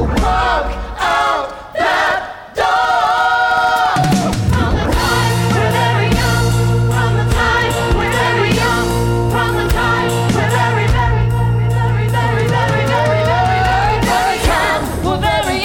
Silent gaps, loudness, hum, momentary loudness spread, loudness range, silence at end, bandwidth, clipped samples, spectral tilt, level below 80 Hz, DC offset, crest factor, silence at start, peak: none; -14 LUFS; none; 3 LU; 1 LU; 0 s; 16.5 kHz; under 0.1%; -5.5 dB/octave; -24 dBFS; under 0.1%; 14 dB; 0 s; 0 dBFS